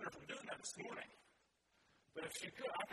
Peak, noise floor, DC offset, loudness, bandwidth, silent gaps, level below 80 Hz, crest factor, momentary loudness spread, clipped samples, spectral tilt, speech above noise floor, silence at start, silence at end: -32 dBFS; -79 dBFS; under 0.1%; -49 LUFS; 13 kHz; none; -84 dBFS; 20 dB; 8 LU; under 0.1%; -2 dB/octave; 30 dB; 0 s; 0 s